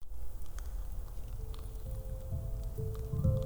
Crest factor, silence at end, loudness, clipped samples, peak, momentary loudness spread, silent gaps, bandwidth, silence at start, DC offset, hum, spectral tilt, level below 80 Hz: 18 dB; 0 s; -41 LUFS; under 0.1%; -18 dBFS; 10 LU; none; over 20 kHz; 0 s; under 0.1%; none; -8 dB/octave; -40 dBFS